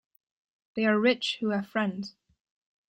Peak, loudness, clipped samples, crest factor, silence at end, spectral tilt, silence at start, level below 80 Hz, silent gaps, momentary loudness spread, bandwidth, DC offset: -12 dBFS; -27 LUFS; under 0.1%; 18 dB; 0.8 s; -5.5 dB/octave; 0.75 s; -74 dBFS; none; 16 LU; 9.2 kHz; under 0.1%